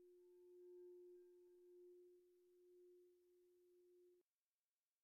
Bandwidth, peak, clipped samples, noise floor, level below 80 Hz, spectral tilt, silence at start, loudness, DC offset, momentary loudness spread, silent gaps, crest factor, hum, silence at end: 1.7 kHz; -58 dBFS; under 0.1%; under -90 dBFS; under -90 dBFS; -0.5 dB/octave; 0 s; -66 LUFS; under 0.1%; 6 LU; none; 10 dB; none; 0.8 s